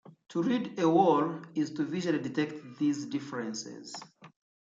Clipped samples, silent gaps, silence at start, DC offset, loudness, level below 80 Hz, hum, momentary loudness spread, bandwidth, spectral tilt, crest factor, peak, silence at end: under 0.1%; none; 0.05 s; under 0.1%; -30 LUFS; -78 dBFS; none; 15 LU; 7.8 kHz; -6 dB/octave; 18 dB; -12 dBFS; 0.4 s